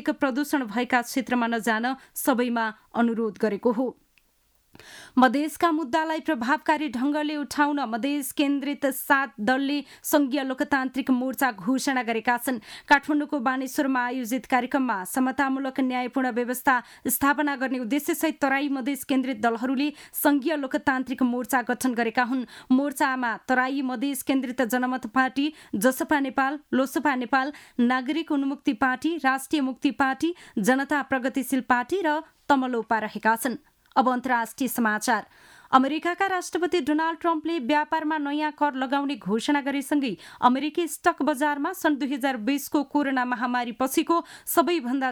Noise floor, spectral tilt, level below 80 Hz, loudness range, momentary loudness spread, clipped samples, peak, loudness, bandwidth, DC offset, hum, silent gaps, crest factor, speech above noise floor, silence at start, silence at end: -66 dBFS; -3.5 dB/octave; -64 dBFS; 1 LU; 5 LU; under 0.1%; -6 dBFS; -25 LUFS; over 20 kHz; under 0.1%; none; none; 20 dB; 41 dB; 0 s; 0 s